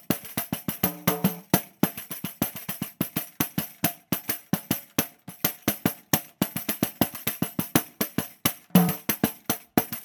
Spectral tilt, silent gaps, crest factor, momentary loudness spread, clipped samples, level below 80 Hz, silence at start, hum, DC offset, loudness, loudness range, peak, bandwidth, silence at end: -4.5 dB/octave; none; 26 dB; 6 LU; under 0.1%; -60 dBFS; 0.1 s; none; under 0.1%; -27 LUFS; 3 LU; -2 dBFS; 17.5 kHz; 0 s